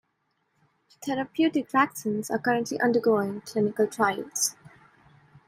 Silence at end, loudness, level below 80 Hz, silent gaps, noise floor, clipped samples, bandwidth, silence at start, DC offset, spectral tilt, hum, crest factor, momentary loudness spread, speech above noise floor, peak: 0.8 s; -26 LUFS; -72 dBFS; none; -75 dBFS; under 0.1%; 16 kHz; 1 s; under 0.1%; -4 dB/octave; none; 20 dB; 7 LU; 49 dB; -8 dBFS